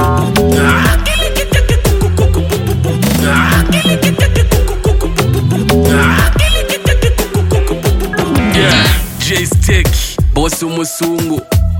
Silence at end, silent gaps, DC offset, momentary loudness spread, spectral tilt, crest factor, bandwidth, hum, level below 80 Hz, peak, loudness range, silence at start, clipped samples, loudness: 0 s; none; under 0.1%; 5 LU; -5 dB/octave; 10 dB; 17 kHz; none; -16 dBFS; 0 dBFS; 1 LU; 0 s; under 0.1%; -12 LUFS